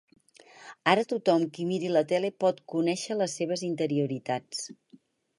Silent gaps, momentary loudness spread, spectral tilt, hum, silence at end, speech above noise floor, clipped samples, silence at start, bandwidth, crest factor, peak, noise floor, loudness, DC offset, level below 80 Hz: none; 8 LU; -5 dB/octave; none; 0.65 s; 32 dB; under 0.1%; 0.6 s; 11.5 kHz; 22 dB; -6 dBFS; -60 dBFS; -28 LUFS; under 0.1%; -78 dBFS